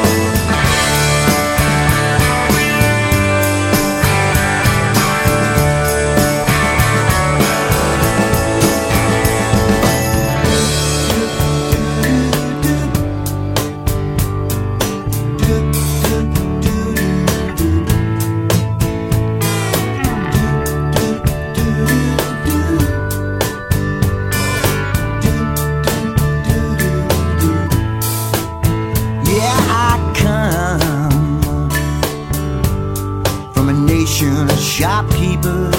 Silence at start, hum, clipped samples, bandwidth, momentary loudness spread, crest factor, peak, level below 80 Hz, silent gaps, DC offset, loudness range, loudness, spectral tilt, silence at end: 0 s; none; under 0.1%; 17 kHz; 5 LU; 14 dB; 0 dBFS; -24 dBFS; none; under 0.1%; 4 LU; -15 LUFS; -5 dB/octave; 0 s